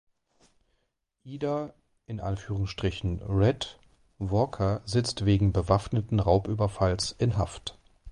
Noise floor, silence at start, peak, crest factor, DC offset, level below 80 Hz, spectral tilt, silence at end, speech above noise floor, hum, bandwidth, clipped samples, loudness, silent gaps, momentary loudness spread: -78 dBFS; 1.25 s; -8 dBFS; 20 dB; under 0.1%; -42 dBFS; -6.5 dB/octave; 0 s; 51 dB; none; 11 kHz; under 0.1%; -28 LUFS; none; 13 LU